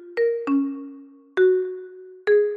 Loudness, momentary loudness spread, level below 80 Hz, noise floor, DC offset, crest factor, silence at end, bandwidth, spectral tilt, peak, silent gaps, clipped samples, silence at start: -23 LUFS; 17 LU; -76 dBFS; -44 dBFS; under 0.1%; 14 dB; 0 s; 5 kHz; -6 dB/octave; -10 dBFS; none; under 0.1%; 0 s